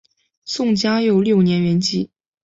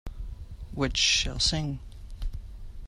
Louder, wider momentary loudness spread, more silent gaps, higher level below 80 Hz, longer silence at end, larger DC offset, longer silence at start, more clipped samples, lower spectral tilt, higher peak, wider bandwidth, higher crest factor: first, -18 LUFS vs -25 LUFS; second, 12 LU vs 22 LU; neither; second, -58 dBFS vs -38 dBFS; first, 0.35 s vs 0 s; neither; first, 0.45 s vs 0.05 s; neither; first, -6 dB/octave vs -2.5 dB/octave; first, -6 dBFS vs -10 dBFS; second, 8 kHz vs 13 kHz; second, 14 dB vs 20 dB